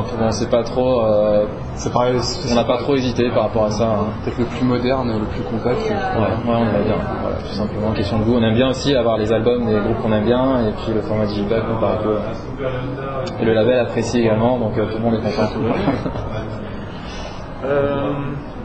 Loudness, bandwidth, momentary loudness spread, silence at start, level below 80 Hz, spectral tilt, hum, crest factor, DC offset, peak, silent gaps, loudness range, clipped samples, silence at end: -19 LUFS; 8.6 kHz; 9 LU; 0 s; -34 dBFS; -6.5 dB/octave; none; 16 dB; under 0.1%; -2 dBFS; none; 3 LU; under 0.1%; 0 s